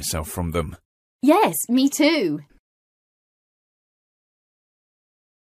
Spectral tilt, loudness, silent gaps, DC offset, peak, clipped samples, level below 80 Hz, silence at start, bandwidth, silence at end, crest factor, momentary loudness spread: -4 dB/octave; -20 LUFS; 0.85-1.19 s; under 0.1%; -4 dBFS; under 0.1%; -46 dBFS; 0 s; 15.5 kHz; 3.2 s; 22 dB; 11 LU